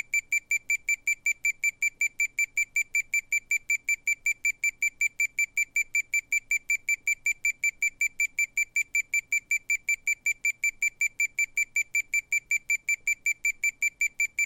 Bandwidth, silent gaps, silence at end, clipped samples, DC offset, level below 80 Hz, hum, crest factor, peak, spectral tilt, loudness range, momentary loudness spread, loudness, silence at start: 17 kHz; none; 0 s; under 0.1%; under 0.1%; -64 dBFS; none; 12 dB; -16 dBFS; 3 dB/octave; 0 LU; 1 LU; -26 LUFS; 0.15 s